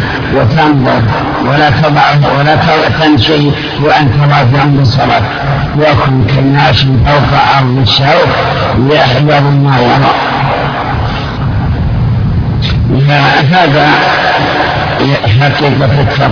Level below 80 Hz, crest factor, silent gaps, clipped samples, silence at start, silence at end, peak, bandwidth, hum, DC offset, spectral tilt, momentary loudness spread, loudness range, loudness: -24 dBFS; 8 dB; none; 0.8%; 0 s; 0 s; 0 dBFS; 5.4 kHz; none; under 0.1%; -7 dB/octave; 5 LU; 3 LU; -8 LUFS